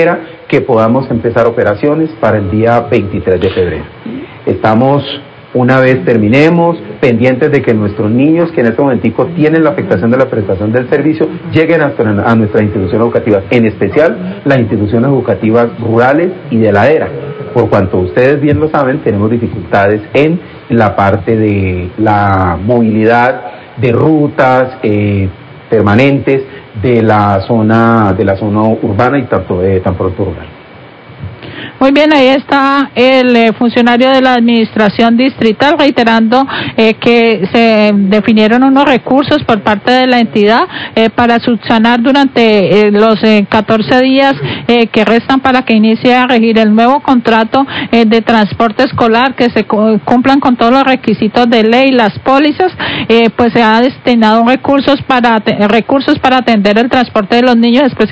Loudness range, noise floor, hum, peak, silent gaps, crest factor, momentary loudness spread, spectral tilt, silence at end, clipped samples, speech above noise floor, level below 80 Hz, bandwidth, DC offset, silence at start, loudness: 3 LU; -33 dBFS; none; 0 dBFS; none; 8 dB; 6 LU; -7.5 dB/octave; 0 s; 2%; 25 dB; -36 dBFS; 8 kHz; under 0.1%; 0 s; -9 LUFS